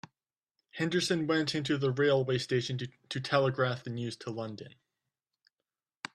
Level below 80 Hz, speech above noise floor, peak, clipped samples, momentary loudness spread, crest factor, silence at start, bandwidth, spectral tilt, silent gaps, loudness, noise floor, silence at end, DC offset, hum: -70 dBFS; over 59 dB; -10 dBFS; under 0.1%; 14 LU; 22 dB; 0.75 s; 12.5 kHz; -5.5 dB/octave; none; -31 LUFS; under -90 dBFS; 1.45 s; under 0.1%; none